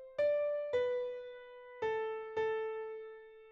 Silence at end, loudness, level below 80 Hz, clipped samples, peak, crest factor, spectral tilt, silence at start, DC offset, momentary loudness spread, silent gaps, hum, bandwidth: 0 s; -37 LUFS; -76 dBFS; under 0.1%; -24 dBFS; 14 dB; -1.5 dB/octave; 0 s; under 0.1%; 18 LU; none; none; 7.2 kHz